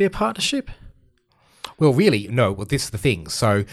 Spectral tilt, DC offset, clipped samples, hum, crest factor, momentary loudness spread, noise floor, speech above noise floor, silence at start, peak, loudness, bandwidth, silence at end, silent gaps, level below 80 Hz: -5 dB/octave; under 0.1%; under 0.1%; none; 18 dB; 9 LU; -60 dBFS; 40 dB; 0 s; -4 dBFS; -20 LUFS; 14.5 kHz; 0 s; none; -44 dBFS